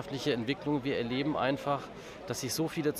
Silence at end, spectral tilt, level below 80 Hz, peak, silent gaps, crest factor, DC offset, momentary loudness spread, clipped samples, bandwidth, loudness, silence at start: 0 s; -5 dB/octave; -62 dBFS; -16 dBFS; none; 16 dB; under 0.1%; 7 LU; under 0.1%; 15.5 kHz; -33 LUFS; 0 s